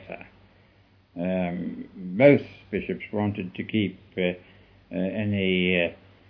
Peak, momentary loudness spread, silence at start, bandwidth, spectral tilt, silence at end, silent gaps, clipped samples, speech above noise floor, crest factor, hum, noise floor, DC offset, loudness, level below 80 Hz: -4 dBFS; 17 LU; 0 s; 5.4 kHz; -9.5 dB/octave; 0.35 s; none; under 0.1%; 34 dB; 22 dB; none; -59 dBFS; under 0.1%; -26 LUFS; -60 dBFS